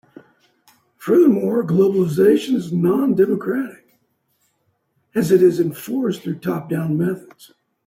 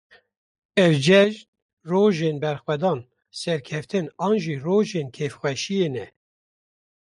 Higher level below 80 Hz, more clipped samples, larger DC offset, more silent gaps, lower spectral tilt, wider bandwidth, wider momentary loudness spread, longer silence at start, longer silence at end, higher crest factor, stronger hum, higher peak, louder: about the same, -62 dBFS vs -66 dBFS; neither; neither; second, none vs 1.48-1.53 s, 1.62-1.77 s; first, -7.5 dB/octave vs -6 dB/octave; first, 16 kHz vs 11.5 kHz; second, 11 LU vs 14 LU; first, 1 s vs 0.75 s; second, 0.65 s vs 1 s; about the same, 16 dB vs 18 dB; neither; about the same, -4 dBFS vs -6 dBFS; first, -18 LUFS vs -22 LUFS